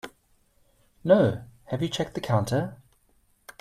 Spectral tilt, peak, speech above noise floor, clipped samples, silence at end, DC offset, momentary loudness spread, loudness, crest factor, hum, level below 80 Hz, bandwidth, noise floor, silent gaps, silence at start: -6.5 dB/octave; -6 dBFS; 41 dB; under 0.1%; 0.85 s; under 0.1%; 16 LU; -26 LUFS; 22 dB; none; -58 dBFS; 14.5 kHz; -65 dBFS; none; 0.05 s